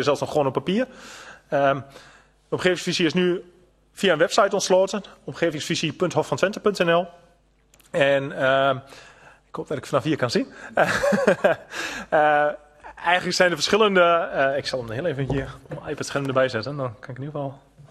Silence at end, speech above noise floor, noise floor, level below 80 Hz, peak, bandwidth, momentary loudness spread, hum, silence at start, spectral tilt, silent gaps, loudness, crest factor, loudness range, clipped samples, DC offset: 0.1 s; 36 dB; -59 dBFS; -54 dBFS; -2 dBFS; 13 kHz; 13 LU; none; 0 s; -4.5 dB/octave; none; -22 LUFS; 20 dB; 4 LU; under 0.1%; under 0.1%